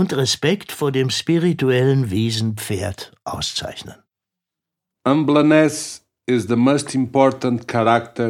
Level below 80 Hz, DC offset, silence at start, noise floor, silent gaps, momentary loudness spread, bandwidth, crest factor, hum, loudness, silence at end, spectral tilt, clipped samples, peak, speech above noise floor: -54 dBFS; under 0.1%; 0 s; -85 dBFS; none; 12 LU; 16.5 kHz; 18 dB; none; -18 LUFS; 0 s; -5.5 dB/octave; under 0.1%; -2 dBFS; 67 dB